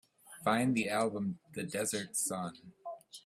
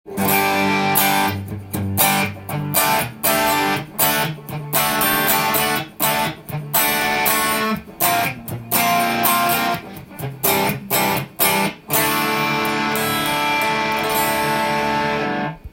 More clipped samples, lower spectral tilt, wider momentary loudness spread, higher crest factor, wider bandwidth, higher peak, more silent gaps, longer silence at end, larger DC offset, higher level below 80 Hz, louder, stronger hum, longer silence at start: neither; about the same, -4 dB/octave vs -3 dB/octave; first, 17 LU vs 8 LU; about the same, 20 dB vs 18 dB; about the same, 16 kHz vs 17 kHz; second, -16 dBFS vs 0 dBFS; neither; about the same, 0.05 s vs 0.05 s; neither; second, -74 dBFS vs -50 dBFS; second, -34 LUFS vs -18 LUFS; neither; first, 0.25 s vs 0.05 s